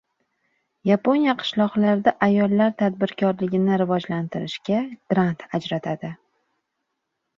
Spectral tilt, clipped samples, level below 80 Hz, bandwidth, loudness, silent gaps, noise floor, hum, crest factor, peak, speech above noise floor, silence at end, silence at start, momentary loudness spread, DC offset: -7.5 dB/octave; under 0.1%; -64 dBFS; 7.2 kHz; -22 LUFS; none; -78 dBFS; none; 20 dB; -2 dBFS; 57 dB; 1.25 s; 0.85 s; 10 LU; under 0.1%